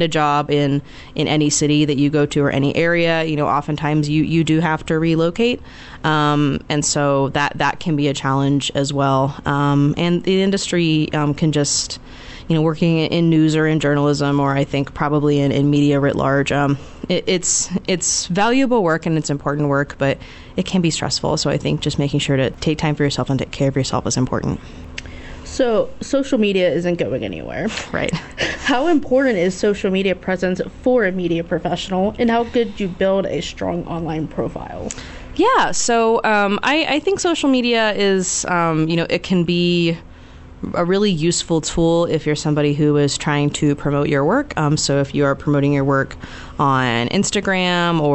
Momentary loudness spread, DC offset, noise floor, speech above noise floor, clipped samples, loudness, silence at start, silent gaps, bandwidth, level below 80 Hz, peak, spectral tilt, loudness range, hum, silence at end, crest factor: 8 LU; under 0.1%; -39 dBFS; 21 dB; under 0.1%; -18 LUFS; 0 s; none; 8.4 kHz; -42 dBFS; -6 dBFS; -5 dB/octave; 3 LU; none; 0 s; 12 dB